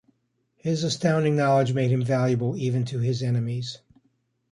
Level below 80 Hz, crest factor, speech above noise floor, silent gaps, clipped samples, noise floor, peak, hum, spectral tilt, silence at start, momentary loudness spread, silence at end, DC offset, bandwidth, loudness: -62 dBFS; 16 dB; 49 dB; none; under 0.1%; -72 dBFS; -10 dBFS; none; -6.5 dB/octave; 0.65 s; 10 LU; 0.75 s; under 0.1%; 10.5 kHz; -24 LUFS